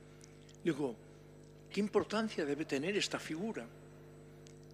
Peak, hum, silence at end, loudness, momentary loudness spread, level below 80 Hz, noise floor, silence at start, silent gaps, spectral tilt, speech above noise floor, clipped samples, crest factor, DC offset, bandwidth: -20 dBFS; 50 Hz at -60 dBFS; 0 s; -37 LUFS; 22 LU; -68 dBFS; -57 dBFS; 0 s; none; -4.5 dB/octave; 20 dB; under 0.1%; 20 dB; under 0.1%; 15 kHz